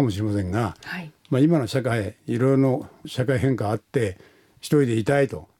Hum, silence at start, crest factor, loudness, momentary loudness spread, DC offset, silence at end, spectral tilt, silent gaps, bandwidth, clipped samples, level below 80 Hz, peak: none; 0 s; 16 dB; -23 LUFS; 10 LU; under 0.1%; 0.15 s; -7 dB/octave; none; 16.5 kHz; under 0.1%; -54 dBFS; -8 dBFS